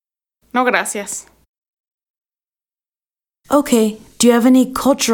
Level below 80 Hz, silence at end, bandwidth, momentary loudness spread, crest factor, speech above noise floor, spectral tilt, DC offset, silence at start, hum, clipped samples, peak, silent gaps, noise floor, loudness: -52 dBFS; 0 s; 19 kHz; 11 LU; 18 dB; over 76 dB; -3.5 dB/octave; under 0.1%; 0.55 s; none; under 0.1%; 0 dBFS; 1.48-1.62 s, 1.68-1.84 s, 1.91-1.98 s, 2.10-2.22 s; under -90 dBFS; -15 LUFS